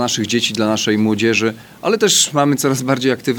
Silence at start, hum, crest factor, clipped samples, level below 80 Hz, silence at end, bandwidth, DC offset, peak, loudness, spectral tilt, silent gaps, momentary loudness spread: 0 s; none; 16 dB; under 0.1%; -62 dBFS; 0 s; over 20 kHz; under 0.1%; 0 dBFS; -15 LUFS; -3.5 dB/octave; none; 6 LU